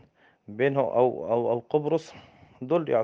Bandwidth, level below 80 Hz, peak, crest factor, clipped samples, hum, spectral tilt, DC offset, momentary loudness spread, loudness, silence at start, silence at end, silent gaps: 7.6 kHz; -72 dBFS; -8 dBFS; 18 dB; under 0.1%; none; -8 dB/octave; under 0.1%; 16 LU; -26 LUFS; 0.5 s; 0 s; none